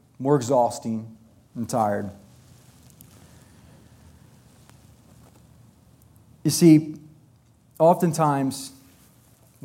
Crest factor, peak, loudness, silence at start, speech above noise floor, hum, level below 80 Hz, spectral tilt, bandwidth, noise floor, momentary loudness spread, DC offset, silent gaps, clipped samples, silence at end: 20 dB; -4 dBFS; -22 LUFS; 0.2 s; 37 dB; none; -64 dBFS; -6 dB/octave; 16.5 kHz; -57 dBFS; 22 LU; under 0.1%; none; under 0.1%; 0.95 s